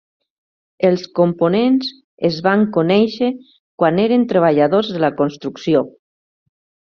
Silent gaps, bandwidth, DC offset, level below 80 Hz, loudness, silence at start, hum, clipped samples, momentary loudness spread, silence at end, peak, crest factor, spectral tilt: 2.04-2.18 s, 3.59-3.78 s; 6.8 kHz; under 0.1%; -60 dBFS; -16 LUFS; 0.8 s; none; under 0.1%; 7 LU; 1.05 s; -2 dBFS; 16 dB; -5.5 dB/octave